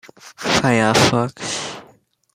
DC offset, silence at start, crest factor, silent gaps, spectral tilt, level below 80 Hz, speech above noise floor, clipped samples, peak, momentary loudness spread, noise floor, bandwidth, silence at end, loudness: under 0.1%; 0.25 s; 18 dB; none; -4 dB/octave; -50 dBFS; 35 dB; under 0.1%; -2 dBFS; 15 LU; -53 dBFS; 16 kHz; 0.55 s; -17 LUFS